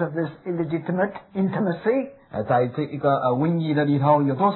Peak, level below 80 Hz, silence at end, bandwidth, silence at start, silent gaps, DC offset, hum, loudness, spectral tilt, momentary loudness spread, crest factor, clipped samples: -6 dBFS; -64 dBFS; 0 s; 4.2 kHz; 0 s; none; under 0.1%; none; -23 LUFS; -12 dB/octave; 9 LU; 16 dB; under 0.1%